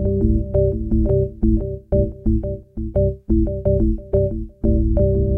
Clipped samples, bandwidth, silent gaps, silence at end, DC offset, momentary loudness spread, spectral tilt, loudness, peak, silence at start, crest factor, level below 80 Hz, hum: under 0.1%; 1.7 kHz; none; 0 s; under 0.1%; 5 LU; -14 dB/octave; -20 LUFS; -4 dBFS; 0 s; 14 dB; -22 dBFS; none